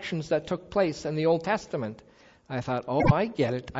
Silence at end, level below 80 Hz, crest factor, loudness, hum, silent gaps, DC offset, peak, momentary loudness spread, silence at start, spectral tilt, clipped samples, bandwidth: 0 s; -48 dBFS; 20 dB; -28 LUFS; none; none; under 0.1%; -6 dBFS; 10 LU; 0 s; -7 dB/octave; under 0.1%; 8 kHz